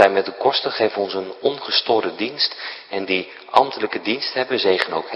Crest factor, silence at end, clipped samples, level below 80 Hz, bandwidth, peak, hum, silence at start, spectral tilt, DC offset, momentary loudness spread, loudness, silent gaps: 20 dB; 0 s; under 0.1%; -66 dBFS; 11 kHz; 0 dBFS; none; 0 s; -4.5 dB/octave; under 0.1%; 7 LU; -20 LUFS; none